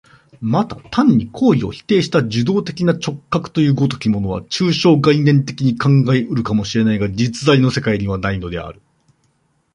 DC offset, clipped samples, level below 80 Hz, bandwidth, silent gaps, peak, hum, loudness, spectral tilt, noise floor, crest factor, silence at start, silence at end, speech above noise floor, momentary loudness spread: under 0.1%; under 0.1%; -44 dBFS; 10.5 kHz; none; -2 dBFS; none; -16 LUFS; -6.5 dB/octave; -62 dBFS; 16 dB; 0.4 s; 1 s; 46 dB; 8 LU